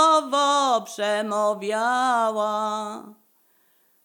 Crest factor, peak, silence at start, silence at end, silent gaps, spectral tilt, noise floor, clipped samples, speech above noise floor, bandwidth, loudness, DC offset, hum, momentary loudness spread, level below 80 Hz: 16 dB; -6 dBFS; 0 s; 0.9 s; none; -2.5 dB/octave; -63 dBFS; under 0.1%; 38 dB; 19.5 kHz; -22 LUFS; under 0.1%; none; 8 LU; under -90 dBFS